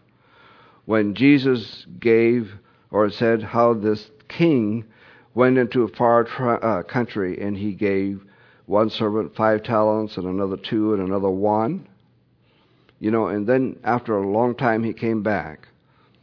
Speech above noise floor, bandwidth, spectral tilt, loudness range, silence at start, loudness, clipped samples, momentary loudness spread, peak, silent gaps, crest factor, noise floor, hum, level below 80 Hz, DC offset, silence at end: 39 dB; 5.4 kHz; -9 dB/octave; 3 LU; 0.9 s; -21 LUFS; under 0.1%; 9 LU; -2 dBFS; none; 18 dB; -59 dBFS; none; -62 dBFS; under 0.1%; 0.65 s